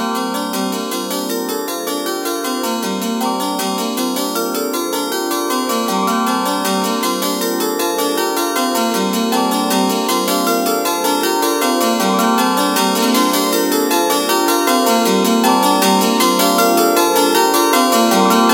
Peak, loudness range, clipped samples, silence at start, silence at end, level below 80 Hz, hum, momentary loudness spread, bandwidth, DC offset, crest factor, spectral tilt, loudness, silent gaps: 0 dBFS; 6 LU; under 0.1%; 0 s; 0 s; -68 dBFS; none; 7 LU; 17.5 kHz; under 0.1%; 16 dB; -3 dB/octave; -15 LUFS; none